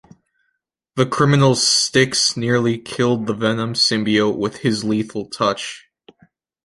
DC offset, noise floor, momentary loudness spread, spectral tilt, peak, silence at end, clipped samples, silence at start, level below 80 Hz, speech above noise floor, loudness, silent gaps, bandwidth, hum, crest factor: under 0.1%; -73 dBFS; 9 LU; -4 dB/octave; -2 dBFS; 0.85 s; under 0.1%; 0.95 s; -56 dBFS; 56 dB; -17 LUFS; none; 11.5 kHz; none; 18 dB